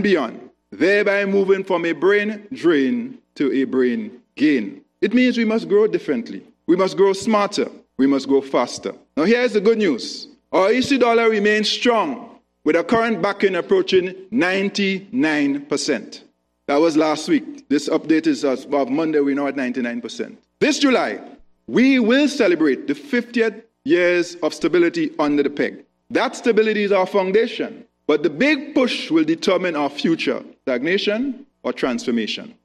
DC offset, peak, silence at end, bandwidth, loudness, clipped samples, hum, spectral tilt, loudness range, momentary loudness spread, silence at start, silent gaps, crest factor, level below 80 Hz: under 0.1%; -6 dBFS; 0.15 s; 11.5 kHz; -19 LUFS; under 0.1%; none; -4.5 dB/octave; 2 LU; 10 LU; 0 s; none; 14 dB; -64 dBFS